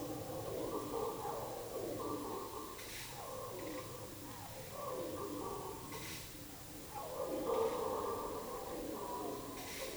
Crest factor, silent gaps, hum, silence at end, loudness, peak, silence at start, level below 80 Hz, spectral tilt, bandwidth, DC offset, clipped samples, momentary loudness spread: 18 dB; none; none; 0 s; -43 LUFS; -24 dBFS; 0 s; -64 dBFS; -4 dB/octave; over 20 kHz; under 0.1%; under 0.1%; 8 LU